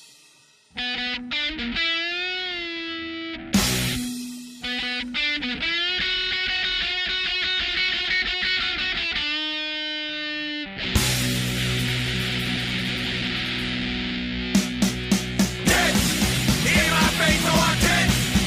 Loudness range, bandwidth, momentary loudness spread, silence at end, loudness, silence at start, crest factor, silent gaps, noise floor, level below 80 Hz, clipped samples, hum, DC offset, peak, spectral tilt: 5 LU; 16 kHz; 9 LU; 0 s; -22 LUFS; 0 s; 18 dB; none; -55 dBFS; -38 dBFS; under 0.1%; none; under 0.1%; -6 dBFS; -3 dB/octave